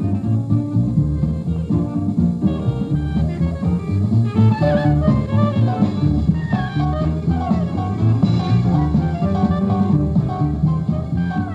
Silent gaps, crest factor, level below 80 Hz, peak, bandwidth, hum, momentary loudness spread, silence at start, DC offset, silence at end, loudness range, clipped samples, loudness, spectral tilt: none; 14 dB; -30 dBFS; -4 dBFS; 7.6 kHz; none; 5 LU; 0 s; under 0.1%; 0 s; 2 LU; under 0.1%; -18 LUFS; -9.5 dB/octave